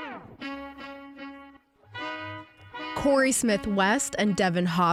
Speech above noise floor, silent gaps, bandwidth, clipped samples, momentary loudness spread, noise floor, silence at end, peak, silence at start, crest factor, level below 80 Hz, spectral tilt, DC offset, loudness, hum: 30 dB; none; 16 kHz; under 0.1%; 20 LU; -53 dBFS; 0 s; -10 dBFS; 0 s; 16 dB; -54 dBFS; -4 dB/octave; under 0.1%; -26 LUFS; none